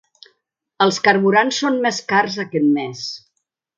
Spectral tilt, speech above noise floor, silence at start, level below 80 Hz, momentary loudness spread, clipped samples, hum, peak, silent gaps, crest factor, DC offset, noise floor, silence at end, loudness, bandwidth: -4 dB/octave; 56 dB; 0.8 s; -70 dBFS; 13 LU; under 0.1%; none; 0 dBFS; none; 18 dB; under 0.1%; -74 dBFS; 0.6 s; -17 LUFS; 9.2 kHz